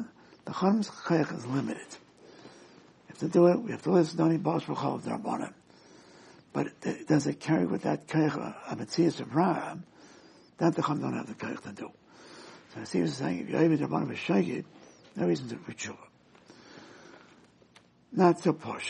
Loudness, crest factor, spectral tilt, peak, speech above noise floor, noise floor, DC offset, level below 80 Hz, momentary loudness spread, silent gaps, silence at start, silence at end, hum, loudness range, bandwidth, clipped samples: -29 LUFS; 22 dB; -6.5 dB/octave; -8 dBFS; 32 dB; -60 dBFS; under 0.1%; -74 dBFS; 20 LU; none; 0 s; 0 s; none; 6 LU; 10.5 kHz; under 0.1%